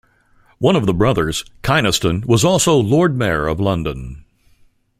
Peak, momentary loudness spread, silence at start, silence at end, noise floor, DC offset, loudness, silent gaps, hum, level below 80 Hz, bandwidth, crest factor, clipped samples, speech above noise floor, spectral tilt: 0 dBFS; 9 LU; 0.6 s; 0.85 s; -54 dBFS; under 0.1%; -16 LUFS; none; none; -38 dBFS; 16 kHz; 18 dB; under 0.1%; 38 dB; -5 dB/octave